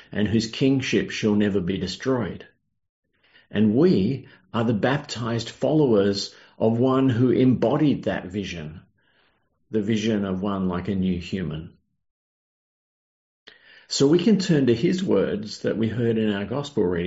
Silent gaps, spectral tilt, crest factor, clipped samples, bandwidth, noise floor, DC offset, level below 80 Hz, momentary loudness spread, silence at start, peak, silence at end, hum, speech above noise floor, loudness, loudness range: 2.89-3.03 s, 12.11-13.46 s; -6 dB/octave; 16 dB; under 0.1%; 8 kHz; -67 dBFS; under 0.1%; -58 dBFS; 11 LU; 0.1 s; -8 dBFS; 0 s; none; 45 dB; -23 LUFS; 6 LU